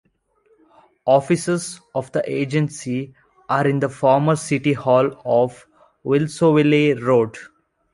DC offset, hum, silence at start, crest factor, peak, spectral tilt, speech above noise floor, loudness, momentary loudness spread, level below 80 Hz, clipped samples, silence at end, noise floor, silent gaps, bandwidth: under 0.1%; none; 1.05 s; 18 dB; -2 dBFS; -6.5 dB/octave; 43 dB; -19 LUFS; 11 LU; -60 dBFS; under 0.1%; 0.5 s; -61 dBFS; none; 11.5 kHz